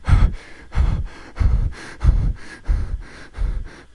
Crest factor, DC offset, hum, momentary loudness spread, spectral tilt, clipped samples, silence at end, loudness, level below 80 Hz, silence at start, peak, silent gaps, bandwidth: 18 dB; under 0.1%; none; 14 LU; -7 dB/octave; under 0.1%; 0.2 s; -24 LUFS; -20 dBFS; 0 s; -2 dBFS; none; 10.5 kHz